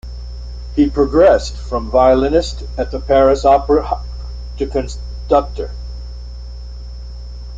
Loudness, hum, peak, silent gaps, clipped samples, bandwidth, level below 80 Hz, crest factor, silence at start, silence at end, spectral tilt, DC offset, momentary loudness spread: -15 LUFS; 60 Hz at -25 dBFS; -2 dBFS; none; under 0.1%; 7.8 kHz; -26 dBFS; 16 dB; 0.05 s; 0 s; -6.5 dB/octave; under 0.1%; 21 LU